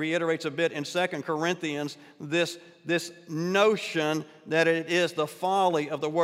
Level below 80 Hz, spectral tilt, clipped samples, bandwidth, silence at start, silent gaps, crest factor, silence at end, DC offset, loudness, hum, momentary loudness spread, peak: -78 dBFS; -4.5 dB/octave; under 0.1%; 16 kHz; 0 s; none; 18 dB; 0 s; under 0.1%; -27 LUFS; none; 9 LU; -8 dBFS